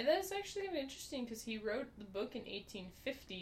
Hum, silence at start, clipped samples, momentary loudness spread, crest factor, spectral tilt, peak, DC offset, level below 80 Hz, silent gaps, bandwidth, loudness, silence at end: none; 0 s; under 0.1%; 7 LU; 20 dB; -3.5 dB/octave; -22 dBFS; under 0.1%; -66 dBFS; none; 16 kHz; -43 LUFS; 0 s